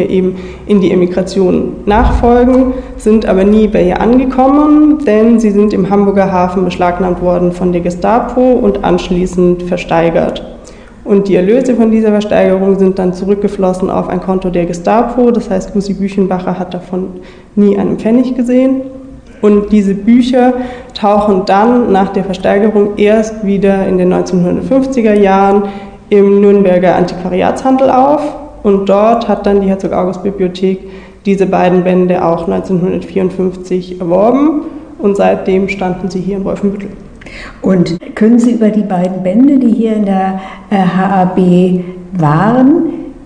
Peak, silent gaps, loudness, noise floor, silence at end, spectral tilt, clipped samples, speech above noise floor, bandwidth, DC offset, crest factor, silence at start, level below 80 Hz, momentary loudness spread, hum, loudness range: 0 dBFS; none; -10 LUFS; -31 dBFS; 0 s; -8 dB/octave; 0.7%; 22 dB; 10 kHz; 0.4%; 10 dB; 0 s; -30 dBFS; 9 LU; none; 4 LU